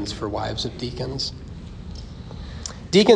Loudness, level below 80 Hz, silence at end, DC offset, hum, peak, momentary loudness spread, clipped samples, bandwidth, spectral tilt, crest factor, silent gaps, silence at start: -27 LUFS; -40 dBFS; 0 s; under 0.1%; none; -4 dBFS; 15 LU; under 0.1%; 10.5 kHz; -5 dB/octave; 20 dB; none; 0 s